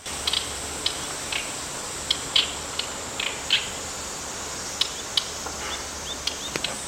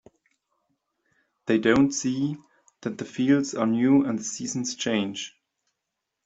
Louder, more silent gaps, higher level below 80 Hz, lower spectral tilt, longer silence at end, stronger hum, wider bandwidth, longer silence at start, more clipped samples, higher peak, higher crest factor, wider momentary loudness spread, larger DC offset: about the same, -26 LUFS vs -25 LUFS; neither; first, -48 dBFS vs -62 dBFS; second, -0.5 dB/octave vs -4.5 dB/octave; second, 0 s vs 0.95 s; neither; first, 17 kHz vs 8 kHz; second, 0 s vs 1.45 s; neither; about the same, -4 dBFS vs -6 dBFS; first, 26 dB vs 20 dB; second, 9 LU vs 15 LU; neither